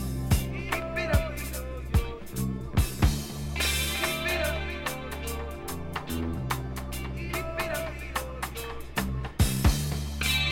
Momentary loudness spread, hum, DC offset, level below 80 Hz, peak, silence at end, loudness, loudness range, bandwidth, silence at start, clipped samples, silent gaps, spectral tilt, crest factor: 9 LU; none; under 0.1%; -34 dBFS; -10 dBFS; 0 s; -30 LUFS; 5 LU; 18 kHz; 0 s; under 0.1%; none; -4.5 dB/octave; 20 dB